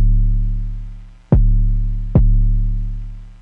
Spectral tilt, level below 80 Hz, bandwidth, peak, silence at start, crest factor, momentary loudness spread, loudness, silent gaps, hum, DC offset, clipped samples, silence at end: -12 dB/octave; -16 dBFS; 1.6 kHz; 0 dBFS; 0 s; 14 dB; 16 LU; -19 LUFS; none; none; under 0.1%; under 0.1%; 0.1 s